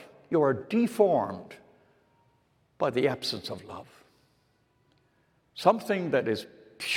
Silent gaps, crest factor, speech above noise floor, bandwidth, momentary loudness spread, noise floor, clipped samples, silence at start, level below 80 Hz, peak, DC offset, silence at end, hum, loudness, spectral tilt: none; 22 dB; 42 dB; 17 kHz; 20 LU; -69 dBFS; under 0.1%; 0 s; -76 dBFS; -8 dBFS; under 0.1%; 0 s; none; -28 LUFS; -5.5 dB/octave